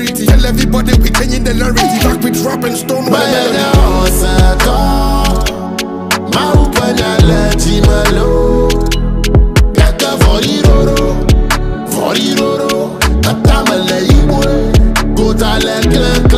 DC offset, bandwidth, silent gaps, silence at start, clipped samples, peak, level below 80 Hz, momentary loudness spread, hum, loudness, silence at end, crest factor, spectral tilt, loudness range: under 0.1%; 16 kHz; none; 0 s; under 0.1%; 0 dBFS; -12 dBFS; 5 LU; none; -11 LUFS; 0 s; 10 dB; -5 dB/octave; 1 LU